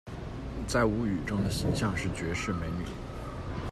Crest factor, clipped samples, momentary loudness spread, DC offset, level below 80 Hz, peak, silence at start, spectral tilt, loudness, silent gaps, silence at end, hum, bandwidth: 18 dB; under 0.1%; 12 LU; under 0.1%; -42 dBFS; -14 dBFS; 0.05 s; -5.5 dB/octave; -32 LUFS; none; 0 s; none; 14 kHz